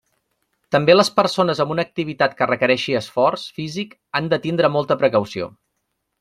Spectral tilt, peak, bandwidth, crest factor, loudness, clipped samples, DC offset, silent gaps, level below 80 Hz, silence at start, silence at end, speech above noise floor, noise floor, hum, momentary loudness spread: -5 dB/octave; -2 dBFS; 13.5 kHz; 18 dB; -19 LUFS; under 0.1%; under 0.1%; none; -60 dBFS; 0.7 s; 0.7 s; 56 dB; -74 dBFS; none; 14 LU